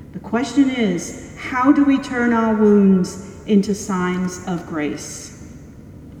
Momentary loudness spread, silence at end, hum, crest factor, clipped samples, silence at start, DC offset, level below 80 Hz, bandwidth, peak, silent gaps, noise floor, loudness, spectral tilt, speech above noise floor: 17 LU; 0 s; none; 16 dB; under 0.1%; 0 s; under 0.1%; -46 dBFS; 13 kHz; -2 dBFS; none; -39 dBFS; -18 LUFS; -6 dB/octave; 21 dB